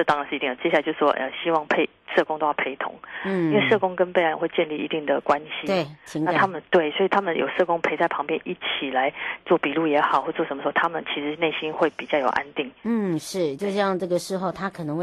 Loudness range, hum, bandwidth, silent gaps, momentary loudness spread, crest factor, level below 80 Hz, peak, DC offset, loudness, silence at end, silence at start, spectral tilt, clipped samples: 2 LU; none; 12.5 kHz; none; 7 LU; 16 dB; -64 dBFS; -6 dBFS; under 0.1%; -24 LUFS; 0 s; 0 s; -5.5 dB/octave; under 0.1%